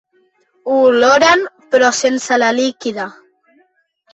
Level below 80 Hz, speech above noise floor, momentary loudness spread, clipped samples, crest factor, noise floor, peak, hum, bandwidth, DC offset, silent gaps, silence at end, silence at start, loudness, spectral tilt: -60 dBFS; 46 dB; 14 LU; under 0.1%; 14 dB; -59 dBFS; 0 dBFS; none; 8.2 kHz; under 0.1%; none; 1 s; 0.65 s; -13 LUFS; -2 dB/octave